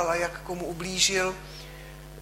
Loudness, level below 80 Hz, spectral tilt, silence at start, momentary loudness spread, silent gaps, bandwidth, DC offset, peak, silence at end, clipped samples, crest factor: -27 LUFS; -48 dBFS; -2 dB/octave; 0 s; 21 LU; none; 16 kHz; under 0.1%; -8 dBFS; 0 s; under 0.1%; 22 dB